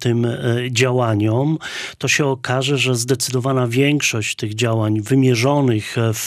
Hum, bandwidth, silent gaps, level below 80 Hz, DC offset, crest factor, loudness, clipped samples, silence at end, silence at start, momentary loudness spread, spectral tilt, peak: none; 15.5 kHz; none; -60 dBFS; under 0.1%; 14 dB; -18 LUFS; under 0.1%; 0 s; 0 s; 5 LU; -5 dB/octave; -2 dBFS